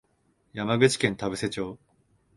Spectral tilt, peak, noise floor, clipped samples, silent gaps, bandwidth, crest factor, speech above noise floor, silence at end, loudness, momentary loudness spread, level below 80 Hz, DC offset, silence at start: -4.5 dB/octave; -4 dBFS; -69 dBFS; under 0.1%; none; 11.5 kHz; 24 dB; 43 dB; 0.6 s; -26 LUFS; 14 LU; -58 dBFS; under 0.1%; 0.55 s